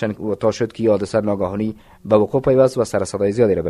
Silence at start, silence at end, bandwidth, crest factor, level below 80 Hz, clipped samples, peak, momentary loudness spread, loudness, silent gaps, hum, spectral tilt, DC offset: 0 s; 0 s; 12.5 kHz; 18 dB; -48 dBFS; under 0.1%; 0 dBFS; 8 LU; -19 LUFS; none; none; -7 dB/octave; under 0.1%